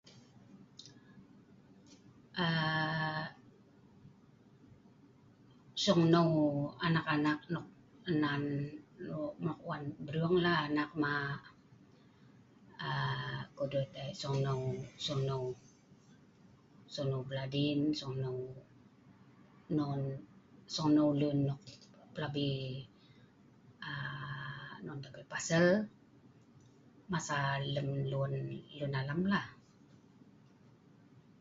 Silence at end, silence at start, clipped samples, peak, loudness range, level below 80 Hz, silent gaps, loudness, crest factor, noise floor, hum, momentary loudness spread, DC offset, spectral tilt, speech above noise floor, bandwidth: 1.85 s; 0.05 s; under 0.1%; -14 dBFS; 7 LU; -68 dBFS; none; -35 LUFS; 22 dB; -63 dBFS; none; 17 LU; under 0.1%; -5 dB/octave; 28 dB; 7.6 kHz